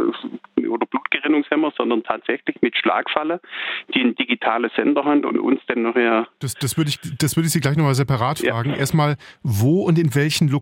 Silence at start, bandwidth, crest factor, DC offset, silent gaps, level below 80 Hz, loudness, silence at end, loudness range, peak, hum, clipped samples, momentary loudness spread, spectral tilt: 0 s; 16.5 kHz; 18 dB; under 0.1%; none; -56 dBFS; -20 LUFS; 0 s; 2 LU; -2 dBFS; none; under 0.1%; 7 LU; -5.5 dB/octave